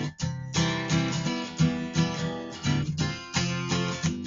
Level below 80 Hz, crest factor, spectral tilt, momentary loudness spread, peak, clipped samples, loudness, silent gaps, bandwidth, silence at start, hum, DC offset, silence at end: -50 dBFS; 16 dB; -5 dB/octave; 5 LU; -10 dBFS; under 0.1%; -28 LUFS; none; 7.8 kHz; 0 s; none; under 0.1%; 0 s